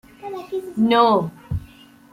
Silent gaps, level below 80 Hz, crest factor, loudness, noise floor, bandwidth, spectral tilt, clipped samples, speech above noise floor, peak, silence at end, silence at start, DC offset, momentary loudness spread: none; -44 dBFS; 18 dB; -20 LUFS; -46 dBFS; 15.5 kHz; -7 dB/octave; under 0.1%; 28 dB; -4 dBFS; 0.45 s; 0.25 s; under 0.1%; 17 LU